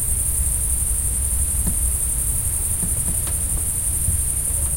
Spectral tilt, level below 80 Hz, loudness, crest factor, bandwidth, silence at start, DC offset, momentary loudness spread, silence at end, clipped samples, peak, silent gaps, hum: -3 dB/octave; -26 dBFS; -19 LUFS; 14 dB; 16.5 kHz; 0 s; under 0.1%; 1 LU; 0 s; under 0.1%; -6 dBFS; none; none